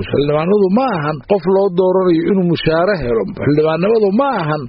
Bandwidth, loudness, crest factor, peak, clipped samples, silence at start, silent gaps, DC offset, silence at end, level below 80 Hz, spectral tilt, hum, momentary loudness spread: 5.6 kHz; -14 LUFS; 12 dB; 0 dBFS; under 0.1%; 0 s; none; under 0.1%; 0 s; -40 dBFS; -6 dB/octave; none; 4 LU